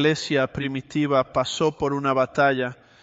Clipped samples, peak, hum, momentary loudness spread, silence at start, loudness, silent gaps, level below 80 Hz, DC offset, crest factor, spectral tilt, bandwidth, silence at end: under 0.1%; -6 dBFS; none; 7 LU; 0 s; -23 LUFS; none; -54 dBFS; under 0.1%; 16 dB; -5 dB/octave; 8.2 kHz; 0.3 s